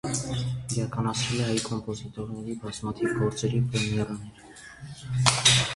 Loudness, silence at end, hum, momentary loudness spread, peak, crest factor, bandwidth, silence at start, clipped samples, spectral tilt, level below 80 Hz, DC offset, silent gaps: -27 LUFS; 0 s; none; 19 LU; -2 dBFS; 26 dB; 11.5 kHz; 0.05 s; under 0.1%; -3.5 dB/octave; -50 dBFS; under 0.1%; none